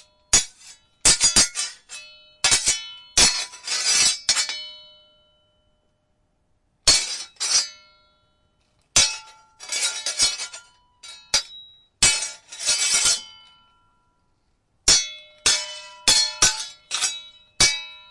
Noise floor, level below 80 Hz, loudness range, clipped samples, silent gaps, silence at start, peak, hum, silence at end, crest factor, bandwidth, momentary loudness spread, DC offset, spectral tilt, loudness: -68 dBFS; -46 dBFS; 5 LU; under 0.1%; none; 0.3 s; -2 dBFS; none; 0.15 s; 22 dB; 12 kHz; 15 LU; under 0.1%; 1 dB/octave; -19 LUFS